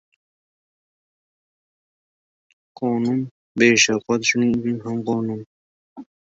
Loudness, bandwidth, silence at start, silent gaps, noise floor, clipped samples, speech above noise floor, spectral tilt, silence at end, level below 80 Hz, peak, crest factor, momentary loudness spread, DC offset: -20 LUFS; 8 kHz; 2.8 s; 3.31-3.55 s, 5.46-5.96 s; under -90 dBFS; under 0.1%; over 70 dB; -3.5 dB/octave; 0.15 s; -60 dBFS; -2 dBFS; 22 dB; 13 LU; under 0.1%